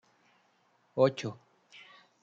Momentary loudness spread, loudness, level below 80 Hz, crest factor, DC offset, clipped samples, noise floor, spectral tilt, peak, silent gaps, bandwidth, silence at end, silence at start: 25 LU; -31 LUFS; -82 dBFS; 22 dB; under 0.1%; under 0.1%; -70 dBFS; -6.5 dB/octave; -12 dBFS; none; 7.6 kHz; 0.9 s; 0.95 s